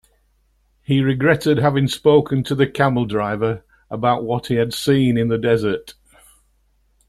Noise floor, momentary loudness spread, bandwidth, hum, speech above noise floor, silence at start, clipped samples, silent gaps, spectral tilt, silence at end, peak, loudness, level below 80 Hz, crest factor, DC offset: -61 dBFS; 8 LU; 14 kHz; none; 44 dB; 0.9 s; under 0.1%; none; -6.5 dB/octave; 1.2 s; -2 dBFS; -18 LUFS; -50 dBFS; 16 dB; under 0.1%